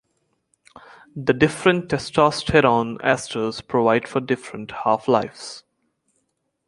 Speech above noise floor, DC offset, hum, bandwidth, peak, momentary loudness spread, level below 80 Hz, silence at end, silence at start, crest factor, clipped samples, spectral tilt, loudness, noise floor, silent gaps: 52 dB; under 0.1%; none; 11.5 kHz; -2 dBFS; 15 LU; -50 dBFS; 1.1 s; 1.15 s; 20 dB; under 0.1%; -5.5 dB/octave; -20 LUFS; -73 dBFS; none